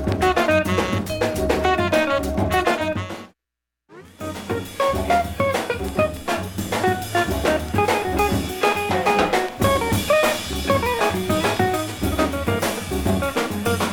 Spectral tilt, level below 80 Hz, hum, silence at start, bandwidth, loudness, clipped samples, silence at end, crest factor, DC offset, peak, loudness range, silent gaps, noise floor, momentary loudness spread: -5 dB/octave; -36 dBFS; none; 0 s; 17.5 kHz; -21 LUFS; under 0.1%; 0 s; 16 dB; under 0.1%; -4 dBFS; 4 LU; none; -84 dBFS; 7 LU